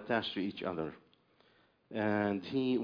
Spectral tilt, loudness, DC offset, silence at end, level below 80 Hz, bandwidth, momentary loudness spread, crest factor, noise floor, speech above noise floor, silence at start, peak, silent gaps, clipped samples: -4 dB/octave; -36 LUFS; under 0.1%; 0 s; -72 dBFS; 5.2 kHz; 9 LU; 18 dB; -69 dBFS; 35 dB; 0 s; -18 dBFS; none; under 0.1%